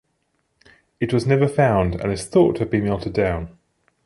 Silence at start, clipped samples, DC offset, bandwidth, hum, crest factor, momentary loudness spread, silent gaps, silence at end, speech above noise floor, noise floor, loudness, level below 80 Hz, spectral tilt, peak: 1 s; under 0.1%; under 0.1%; 11.5 kHz; none; 18 dB; 9 LU; none; 0.55 s; 51 dB; -70 dBFS; -20 LUFS; -40 dBFS; -7 dB/octave; -4 dBFS